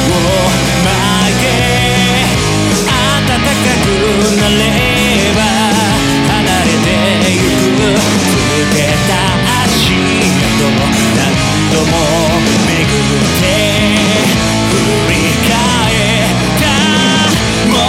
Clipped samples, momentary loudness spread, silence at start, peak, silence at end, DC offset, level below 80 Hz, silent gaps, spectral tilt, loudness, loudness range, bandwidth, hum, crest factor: under 0.1%; 1 LU; 0 s; 0 dBFS; 0 s; under 0.1%; -26 dBFS; none; -4 dB/octave; -10 LUFS; 0 LU; 17 kHz; none; 10 dB